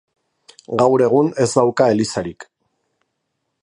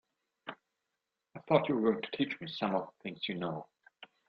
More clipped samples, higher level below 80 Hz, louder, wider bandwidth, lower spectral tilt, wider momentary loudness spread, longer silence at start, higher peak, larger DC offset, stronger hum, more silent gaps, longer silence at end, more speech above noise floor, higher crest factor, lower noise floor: neither; first, -56 dBFS vs -76 dBFS; first, -16 LUFS vs -34 LUFS; first, 11 kHz vs 6.4 kHz; second, -5.5 dB/octave vs -8 dB/octave; second, 11 LU vs 19 LU; first, 0.7 s vs 0.45 s; first, -2 dBFS vs -12 dBFS; neither; neither; neither; first, 1.2 s vs 0.25 s; first, 58 dB vs 54 dB; second, 18 dB vs 24 dB; second, -74 dBFS vs -87 dBFS